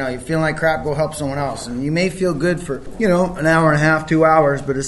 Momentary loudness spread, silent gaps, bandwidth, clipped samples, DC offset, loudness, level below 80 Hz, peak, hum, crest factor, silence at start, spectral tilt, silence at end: 9 LU; none; 12 kHz; under 0.1%; under 0.1%; -17 LUFS; -40 dBFS; 0 dBFS; none; 18 dB; 0 s; -6 dB/octave; 0 s